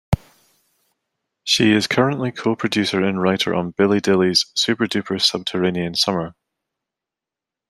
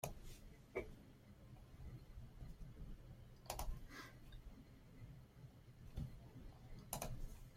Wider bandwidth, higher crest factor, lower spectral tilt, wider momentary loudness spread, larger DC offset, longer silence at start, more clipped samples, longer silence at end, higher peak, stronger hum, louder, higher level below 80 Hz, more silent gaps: second, 14.5 kHz vs 16.5 kHz; second, 18 dB vs 26 dB; about the same, -4.5 dB/octave vs -4.5 dB/octave; second, 7 LU vs 13 LU; neither; about the same, 0.1 s vs 0 s; neither; first, 1.4 s vs 0 s; first, -2 dBFS vs -26 dBFS; neither; first, -19 LUFS vs -56 LUFS; first, -46 dBFS vs -56 dBFS; neither